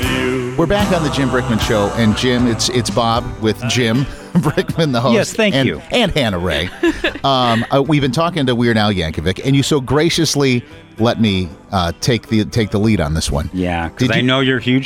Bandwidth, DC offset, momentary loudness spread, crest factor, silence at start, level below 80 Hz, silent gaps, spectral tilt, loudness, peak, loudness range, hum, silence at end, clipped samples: 16.5 kHz; under 0.1%; 5 LU; 12 dB; 0 s; -34 dBFS; none; -5 dB/octave; -16 LUFS; -4 dBFS; 1 LU; none; 0 s; under 0.1%